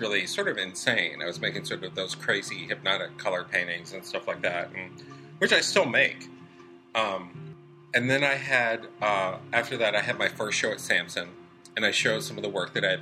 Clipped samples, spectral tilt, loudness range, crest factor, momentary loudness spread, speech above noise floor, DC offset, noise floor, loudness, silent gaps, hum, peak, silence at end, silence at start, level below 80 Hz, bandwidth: under 0.1%; -3 dB/octave; 4 LU; 22 dB; 13 LU; 23 dB; under 0.1%; -50 dBFS; -27 LUFS; none; none; -6 dBFS; 0 s; 0 s; -72 dBFS; 15 kHz